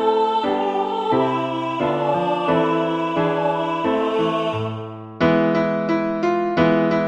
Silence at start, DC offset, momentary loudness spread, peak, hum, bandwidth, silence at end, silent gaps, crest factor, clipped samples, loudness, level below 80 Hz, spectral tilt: 0 s; under 0.1%; 5 LU; -4 dBFS; none; 8.4 kHz; 0 s; none; 14 dB; under 0.1%; -20 LUFS; -54 dBFS; -7.5 dB/octave